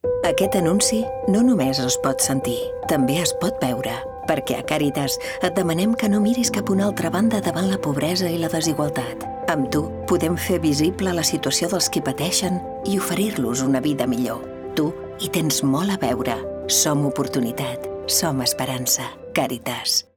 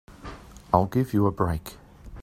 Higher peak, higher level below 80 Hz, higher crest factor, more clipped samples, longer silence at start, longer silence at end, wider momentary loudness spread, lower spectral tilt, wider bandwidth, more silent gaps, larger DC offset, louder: about the same, -4 dBFS vs -2 dBFS; about the same, -50 dBFS vs -46 dBFS; second, 18 dB vs 24 dB; neither; about the same, 0.05 s vs 0.1 s; first, 0.15 s vs 0 s; second, 7 LU vs 20 LU; second, -4 dB/octave vs -8 dB/octave; first, over 20 kHz vs 15.5 kHz; neither; neither; first, -21 LUFS vs -25 LUFS